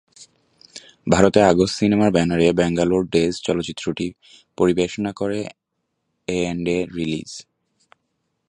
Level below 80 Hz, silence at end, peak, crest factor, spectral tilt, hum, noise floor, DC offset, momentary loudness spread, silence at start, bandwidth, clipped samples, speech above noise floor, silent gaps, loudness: -46 dBFS; 1.1 s; 0 dBFS; 20 dB; -5.5 dB/octave; none; -76 dBFS; under 0.1%; 18 LU; 0.2 s; 11 kHz; under 0.1%; 56 dB; none; -20 LUFS